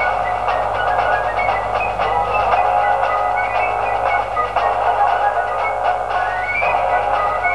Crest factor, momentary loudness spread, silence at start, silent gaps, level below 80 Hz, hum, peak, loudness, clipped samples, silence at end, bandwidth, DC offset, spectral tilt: 14 dB; 3 LU; 0 s; none; -40 dBFS; 50 Hz at -40 dBFS; -2 dBFS; -17 LUFS; under 0.1%; 0 s; 11 kHz; 0.6%; -4.5 dB/octave